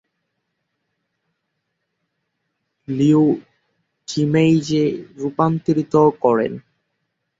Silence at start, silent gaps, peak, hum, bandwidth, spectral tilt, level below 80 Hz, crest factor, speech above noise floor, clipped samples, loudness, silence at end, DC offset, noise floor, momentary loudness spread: 2.9 s; none; -4 dBFS; none; 7.8 kHz; -7.5 dB/octave; -60 dBFS; 18 dB; 58 dB; under 0.1%; -18 LUFS; 0.8 s; under 0.1%; -75 dBFS; 12 LU